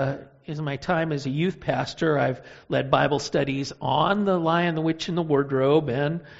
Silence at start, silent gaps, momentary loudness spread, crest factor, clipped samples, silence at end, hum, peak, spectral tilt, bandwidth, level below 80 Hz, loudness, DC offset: 0 s; none; 8 LU; 20 dB; under 0.1%; 0 s; none; -4 dBFS; -5 dB/octave; 8 kHz; -54 dBFS; -24 LUFS; under 0.1%